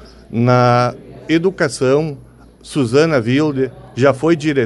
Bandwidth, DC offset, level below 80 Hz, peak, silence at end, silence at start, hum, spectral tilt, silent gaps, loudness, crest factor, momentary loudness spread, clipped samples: 11.5 kHz; under 0.1%; -48 dBFS; 0 dBFS; 0 s; 0.05 s; none; -6.5 dB/octave; none; -16 LUFS; 16 dB; 12 LU; under 0.1%